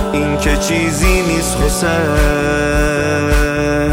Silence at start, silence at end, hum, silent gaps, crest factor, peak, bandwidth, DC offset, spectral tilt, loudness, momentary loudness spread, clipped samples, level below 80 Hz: 0 s; 0 s; none; none; 12 dB; 0 dBFS; 16.5 kHz; under 0.1%; -4.5 dB/octave; -14 LUFS; 2 LU; under 0.1%; -20 dBFS